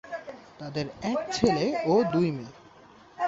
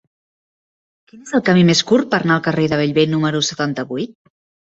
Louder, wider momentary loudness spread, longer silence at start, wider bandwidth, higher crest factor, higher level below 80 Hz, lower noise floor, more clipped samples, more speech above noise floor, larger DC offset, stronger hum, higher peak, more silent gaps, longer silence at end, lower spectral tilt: second, -27 LUFS vs -16 LUFS; first, 17 LU vs 11 LU; second, 0.05 s vs 1.15 s; about the same, 8 kHz vs 8 kHz; first, 24 dB vs 18 dB; about the same, -56 dBFS vs -56 dBFS; second, -53 dBFS vs under -90 dBFS; neither; second, 27 dB vs over 74 dB; neither; neither; second, -4 dBFS vs 0 dBFS; neither; second, 0 s vs 0.65 s; about the same, -6 dB/octave vs -5 dB/octave